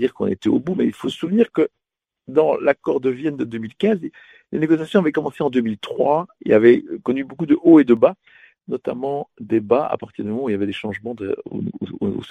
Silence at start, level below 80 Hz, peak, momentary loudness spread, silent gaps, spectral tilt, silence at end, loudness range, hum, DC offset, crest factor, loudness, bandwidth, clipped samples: 0 s; -60 dBFS; 0 dBFS; 13 LU; none; -8 dB/octave; 0 s; 7 LU; none; under 0.1%; 20 dB; -20 LUFS; 9.2 kHz; under 0.1%